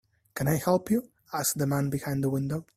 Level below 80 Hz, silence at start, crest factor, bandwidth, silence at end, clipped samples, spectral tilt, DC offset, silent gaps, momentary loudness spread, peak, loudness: -58 dBFS; 0.35 s; 18 dB; 16 kHz; 0.15 s; under 0.1%; -5.5 dB/octave; under 0.1%; none; 6 LU; -10 dBFS; -28 LUFS